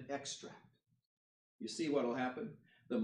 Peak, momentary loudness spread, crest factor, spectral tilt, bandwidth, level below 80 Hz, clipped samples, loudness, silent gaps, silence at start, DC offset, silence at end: -24 dBFS; 14 LU; 20 dB; -4 dB/octave; 10.5 kHz; -88 dBFS; under 0.1%; -41 LUFS; 1.06-1.59 s; 0 s; under 0.1%; 0 s